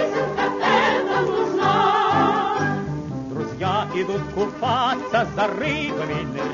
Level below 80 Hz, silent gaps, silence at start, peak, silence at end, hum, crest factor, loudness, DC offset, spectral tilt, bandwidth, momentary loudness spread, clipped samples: -50 dBFS; none; 0 s; -6 dBFS; 0 s; none; 14 dB; -21 LUFS; under 0.1%; -5.5 dB/octave; 7.4 kHz; 8 LU; under 0.1%